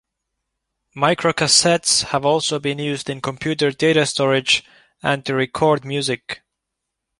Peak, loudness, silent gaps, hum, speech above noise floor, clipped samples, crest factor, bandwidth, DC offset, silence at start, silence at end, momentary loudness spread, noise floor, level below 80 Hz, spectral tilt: -2 dBFS; -18 LUFS; none; none; 61 dB; under 0.1%; 18 dB; 11.5 kHz; under 0.1%; 0.95 s; 0.85 s; 11 LU; -80 dBFS; -56 dBFS; -3 dB/octave